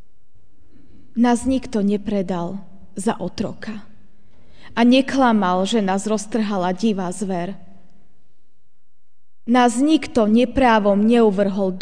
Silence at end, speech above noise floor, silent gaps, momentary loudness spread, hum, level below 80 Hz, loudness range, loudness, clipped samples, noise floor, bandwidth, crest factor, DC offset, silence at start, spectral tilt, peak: 0 s; 47 dB; none; 14 LU; none; -46 dBFS; 7 LU; -19 LUFS; under 0.1%; -65 dBFS; 10 kHz; 16 dB; 2%; 1.15 s; -5.5 dB/octave; -2 dBFS